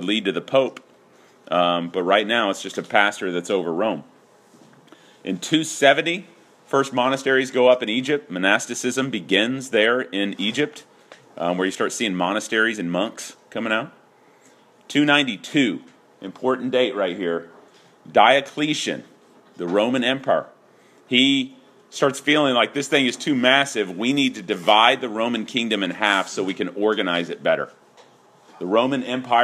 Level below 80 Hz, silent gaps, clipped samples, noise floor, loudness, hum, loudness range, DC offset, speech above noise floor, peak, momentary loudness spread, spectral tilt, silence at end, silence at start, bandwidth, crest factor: -74 dBFS; none; under 0.1%; -54 dBFS; -21 LUFS; none; 4 LU; under 0.1%; 33 dB; 0 dBFS; 10 LU; -3.5 dB/octave; 0 s; 0 s; 14 kHz; 22 dB